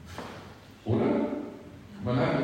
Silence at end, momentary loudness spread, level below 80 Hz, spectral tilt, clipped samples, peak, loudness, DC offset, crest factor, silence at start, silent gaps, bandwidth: 0 s; 20 LU; -56 dBFS; -8 dB/octave; under 0.1%; -14 dBFS; -30 LUFS; under 0.1%; 16 dB; 0 s; none; 16 kHz